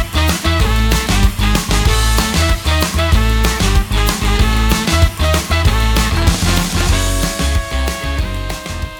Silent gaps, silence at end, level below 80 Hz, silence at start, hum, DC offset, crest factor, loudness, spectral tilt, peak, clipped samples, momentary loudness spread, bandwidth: none; 0 s; -16 dBFS; 0 s; none; under 0.1%; 14 dB; -15 LUFS; -4 dB/octave; 0 dBFS; under 0.1%; 5 LU; 20 kHz